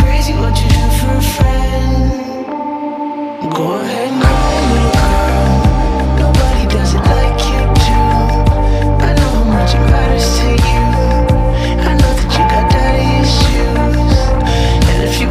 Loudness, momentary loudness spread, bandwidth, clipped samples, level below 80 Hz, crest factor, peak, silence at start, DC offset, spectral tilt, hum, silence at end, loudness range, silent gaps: -13 LUFS; 5 LU; 15.5 kHz; under 0.1%; -14 dBFS; 10 dB; 0 dBFS; 0 s; under 0.1%; -6 dB/octave; none; 0 s; 3 LU; none